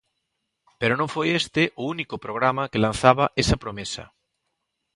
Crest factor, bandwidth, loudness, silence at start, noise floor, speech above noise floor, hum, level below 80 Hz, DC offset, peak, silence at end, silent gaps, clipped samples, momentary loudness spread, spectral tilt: 24 dB; 11.5 kHz; -23 LUFS; 0.8 s; -78 dBFS; 55 dB; none; -42 dBFS; under 0.1%; 0 dBFS; 0.9 s; none; under 0.1%; 12 LU; -5 dB/octave